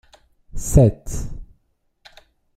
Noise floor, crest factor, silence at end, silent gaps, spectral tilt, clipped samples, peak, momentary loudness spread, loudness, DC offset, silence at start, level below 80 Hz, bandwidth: -66 dBFS; 20 dB; 1.15 s; none; -7.5 dB/octave; under 0.1%; -2 dBFS; 25 LU; -19 LUFS; under 0.1%; 0.55 s; -30 dBFS; 15.5 kHz